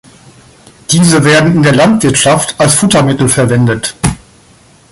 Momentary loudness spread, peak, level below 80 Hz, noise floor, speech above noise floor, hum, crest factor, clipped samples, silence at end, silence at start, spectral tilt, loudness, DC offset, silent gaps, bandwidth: 9 LU; 0 dBFS; -36 dBFS; -42 dBFS; 34 dB; none; 10 dB; under 0.1%; 0.75 s; 0.9 s; -4.5 dB/octave; -8 LUFS; under 0.1%; none; 16 kHz